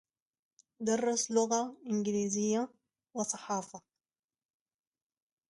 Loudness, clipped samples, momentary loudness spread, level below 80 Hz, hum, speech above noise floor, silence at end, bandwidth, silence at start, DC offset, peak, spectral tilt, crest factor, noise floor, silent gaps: -33 LUFS; under 0.1%; 12 LU; -80 dBFS; none; over 58 dB; 1.7 s; 11.5 kHz; 0.8 s; under 0.1%; -16 dBFS; -4 dB/octave; 20 dB; under -90 dBFS; none